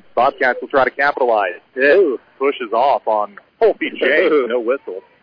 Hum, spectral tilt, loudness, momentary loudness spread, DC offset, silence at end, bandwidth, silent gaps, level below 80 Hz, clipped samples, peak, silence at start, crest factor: none; -6 dB/octave; -16 LUFS; 7 LU; under 0.1%; 0.25 s; 5.4 kHz; none; -58 dBFS; under 0.1%; -4 dBFS; 0.15 s; 12 dB